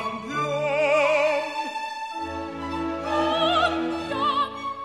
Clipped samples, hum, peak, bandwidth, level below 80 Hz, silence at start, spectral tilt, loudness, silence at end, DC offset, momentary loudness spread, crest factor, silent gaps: under 0.1%; none; -10 dBFS; 12.5 kHz; -52 dBFS; 0 s; -4.5 dB/octave; -24 LUFS; 0 s; under 0.1%; 11 LU; 16 dB; none